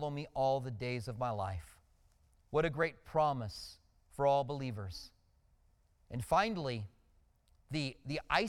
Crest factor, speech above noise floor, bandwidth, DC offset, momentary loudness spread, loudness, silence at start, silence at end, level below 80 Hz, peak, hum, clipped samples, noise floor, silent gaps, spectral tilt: 22 dB; 35 dB; 16.5 kHz; under 0.1%; 15 LU; -36 LUFS; 0 s; 0 s; -58 dBFS; -14 dBFS; none; under 0.1%; -70 dBFS; none; -6 dB/octave